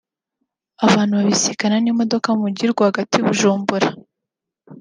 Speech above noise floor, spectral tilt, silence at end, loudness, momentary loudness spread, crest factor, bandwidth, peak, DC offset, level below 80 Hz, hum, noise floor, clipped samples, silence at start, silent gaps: 66 dB; -4.5 dB/octave; 0 s; -17 LUFS; 4 LU; 18 dB; 10 kHz; -2 dBFS; under 0.1%; -64 dBFS; none; -83 dBFS; under 0.1%; 0.8 s; none